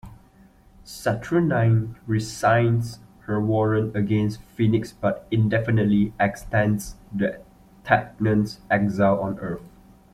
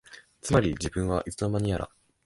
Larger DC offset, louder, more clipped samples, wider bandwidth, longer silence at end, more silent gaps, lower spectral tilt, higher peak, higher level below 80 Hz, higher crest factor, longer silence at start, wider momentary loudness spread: neither; first, -23 LUFS vs -28 LUFS; neither; first, 14 kHz vs 11.5 kHz; about the same, 0.45 s vs 0.4 s; neither; first, -7.5 dB/octave vs -6 dB/octave; first, -2 dBFS vs -8 dBFS; second, -48 dBFS vs -42 dBFS; about the same, 20 dB vs 20 dB; about the same, 0.05 s vs 0.1 s; about the same, 9 LU vs 10 LU